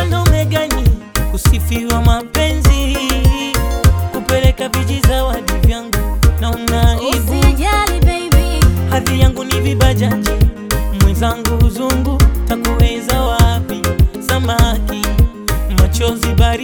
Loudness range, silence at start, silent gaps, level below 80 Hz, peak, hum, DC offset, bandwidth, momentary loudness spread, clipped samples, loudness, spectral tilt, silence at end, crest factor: 1 LU; 0 s; none; -16 dBFS; 0 dBFS; none; under 0.1%; over 20 kHz; 4 LU; under 0.1%; -14 LUFS; -5 dB/octave; 0 s; 12 dB